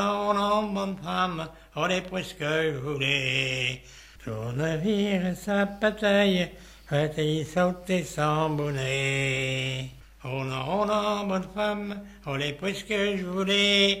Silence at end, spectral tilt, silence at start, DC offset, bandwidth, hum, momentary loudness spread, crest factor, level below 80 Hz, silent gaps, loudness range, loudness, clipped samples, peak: 0 s; -5 dB/octave; 0 s; under 0.1%; 16 kHz; none; 11 LU; 18 dB; -52 dBFS; none; 3 LU; -27 LUFS; under 0.1%; -8 dBFS